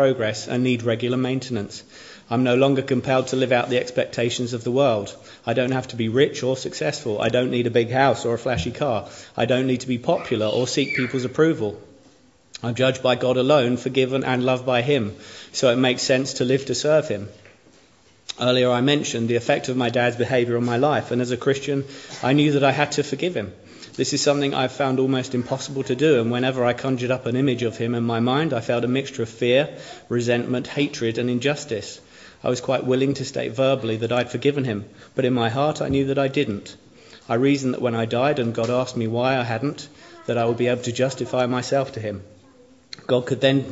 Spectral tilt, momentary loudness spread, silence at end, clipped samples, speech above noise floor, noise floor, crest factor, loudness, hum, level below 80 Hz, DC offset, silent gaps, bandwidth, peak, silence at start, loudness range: -5.5 dB/octave; 10 LU; 0 s; under 0.1%; 34 dB; -55 dBFS; 20 dB; -22 LUFS; none; -58 dBFS; under 0.1%; none; 8 kHz; -2 dBFS; 0 s; 3 LU